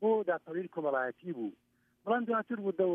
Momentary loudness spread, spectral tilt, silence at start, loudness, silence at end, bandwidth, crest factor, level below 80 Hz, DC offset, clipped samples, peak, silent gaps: 9 LU; -9 dB/octave; 0 s; -34 LUFS; 0 s; 3.7 kHz; 16 dB; -86 dBFS; under 0.1%; under 0.1%; -18 dBFS; none